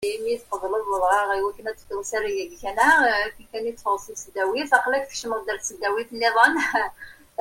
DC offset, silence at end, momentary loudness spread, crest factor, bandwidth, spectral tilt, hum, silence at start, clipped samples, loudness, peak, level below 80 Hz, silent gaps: under 0.1%; 0.3 s; 13 LU; 22 dB; 16.5 kHz; -1.5 dB/octave; none; 0 s; under 0.1%; -23 LUFS; -2 dBFS; -54 dBFS; none